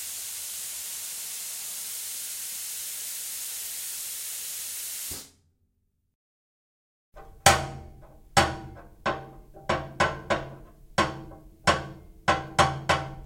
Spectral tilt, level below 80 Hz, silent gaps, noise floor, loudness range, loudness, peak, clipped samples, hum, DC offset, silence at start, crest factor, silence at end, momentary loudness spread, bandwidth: -2.5 dB/octave; -50 dBFS; 6.15-7.12 s; -73 dBFS; 7 LU; -28 LUFS; -4 dBFS; under 0.1%; none; under 0.1%; 0 s; 26 dB; 0 s; 15 LU; 16.5 kHz